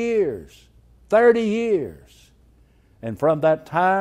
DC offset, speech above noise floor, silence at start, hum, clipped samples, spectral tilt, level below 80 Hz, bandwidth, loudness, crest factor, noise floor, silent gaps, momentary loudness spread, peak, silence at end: under 0.1%; 35 dB; 0 s; none; under 0.1%; -7 dB/octave; -54 dBFS; 11.5 kHz; -20 LUFS; 18 dB; -55 dBFS; none; 18 LU; -4 dBFS; 0 s